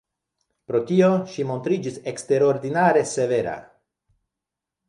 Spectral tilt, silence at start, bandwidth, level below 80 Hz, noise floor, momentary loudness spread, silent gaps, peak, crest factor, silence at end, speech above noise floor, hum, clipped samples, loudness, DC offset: -6 dB/octave; 0.7 s; 11.5 kHz; -64 dBFS; -86 dBFS; 11 LU; none; -6 dBFS; 18 dB; 1.25 s; 65 dB; none; under 0.1%; -22 LUFS; under 0.1%